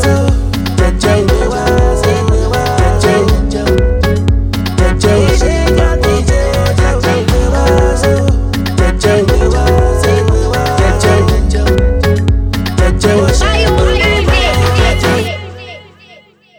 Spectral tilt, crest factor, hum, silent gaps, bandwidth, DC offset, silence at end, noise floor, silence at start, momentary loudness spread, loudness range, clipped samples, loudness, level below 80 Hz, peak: -5.5 dB/octave; 10 dB; none; none; 17 kHz; under 0.1%; 0.75 s; -41 dBFS; 0 s; 3 LU; 1 LU; under 0.1%; -11 LUFS; -14 dBFS; 0 dBFS